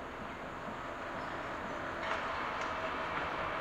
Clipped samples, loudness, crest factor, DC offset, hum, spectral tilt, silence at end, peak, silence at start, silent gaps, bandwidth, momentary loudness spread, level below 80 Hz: under 0.1%; -38 LUFS; 18 dB; under 0.1%; none; -4.5 dB/octave; 0 s; -20 dBFS; 0 s; none; 16 kHz; 6 LU; -58 dBFS